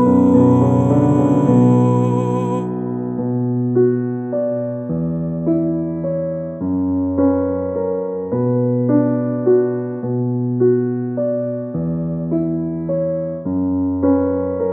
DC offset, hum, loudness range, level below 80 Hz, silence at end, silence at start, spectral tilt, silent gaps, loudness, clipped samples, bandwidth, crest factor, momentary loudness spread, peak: under 0.1%; none; 4 LU; -54 dBFS; 0 s; 0 s; -11 dB/octave; none; -18 LUFS; under 0.1%; 8.2 kHz; 14 dB; 9 LU; -2 dBFS